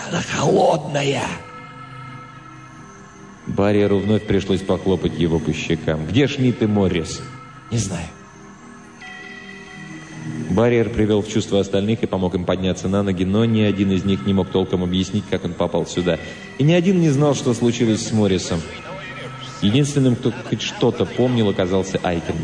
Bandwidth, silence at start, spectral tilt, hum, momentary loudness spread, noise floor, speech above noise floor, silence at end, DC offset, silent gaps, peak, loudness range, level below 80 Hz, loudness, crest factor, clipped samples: 10 kHz; 0 s; -6 dB/octave; none; 19 LU; -41 dBFS; 22 dB; 0 s; under 0.1%; none; -4 dBFS; 5 LU; -44 dBFS; -19 LUFS; 14 dB; under 0.1%